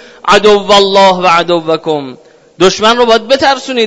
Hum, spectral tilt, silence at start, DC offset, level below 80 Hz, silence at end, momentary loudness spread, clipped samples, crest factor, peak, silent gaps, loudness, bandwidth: none; -3.5 dB/octave; 0.25 s; under 0.1%; -42 dBFS; 0 s; 7 LU; 2%; 8 dB; 0 dBFS; none; -8 LUFS; 11 kHz